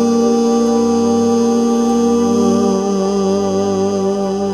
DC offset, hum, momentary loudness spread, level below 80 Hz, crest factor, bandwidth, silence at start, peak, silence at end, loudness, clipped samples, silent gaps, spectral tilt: under 0.1%; 50 Hz at -35 dBFS; 3 LU; -48 dBFS; 12 dB; 12 kHz; 0 s; -2 dBFS; 0 s; -14 LUFS; under 0.1%; none; -6 dB/octave